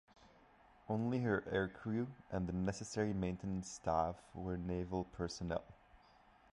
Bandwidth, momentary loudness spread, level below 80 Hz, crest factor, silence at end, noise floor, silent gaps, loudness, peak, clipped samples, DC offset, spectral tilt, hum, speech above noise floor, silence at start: 11.5 kHz; 6 LU; -58 dBFS; 20 dB; 0.55 s; -67 dBFS; none; -41 LUFS; -22 dBFS; under 0.1%; under 0.1%; -6.5 dB/octave; none; 27 dB; 0.2 s